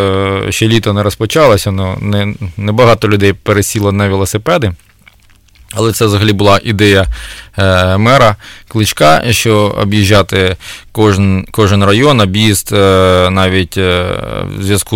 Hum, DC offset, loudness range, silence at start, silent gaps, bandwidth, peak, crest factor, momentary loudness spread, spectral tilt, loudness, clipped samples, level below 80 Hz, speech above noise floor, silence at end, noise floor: none; under 0.1%; 3 LU; 0 s; none; 16.5 kHz; 0 dBFS; 10 dB; 9 LU; -5 dB/octave; -10 LUFS; under 0.1%; -32 dBFS; 35 dB; 0 s; -44 dBFS